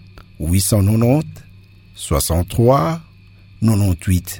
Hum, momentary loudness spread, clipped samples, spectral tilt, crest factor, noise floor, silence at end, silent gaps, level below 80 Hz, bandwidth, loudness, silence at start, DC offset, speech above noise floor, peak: none; 13 LU; under 0.1%; -6 dB/octave; 16 dB; -44 dBFS; 0 s; none; -32 dBFS; 18.5 kHz; -17 LUFS; 0.15 s; under 0.1%; 28 dB; -2 dBFS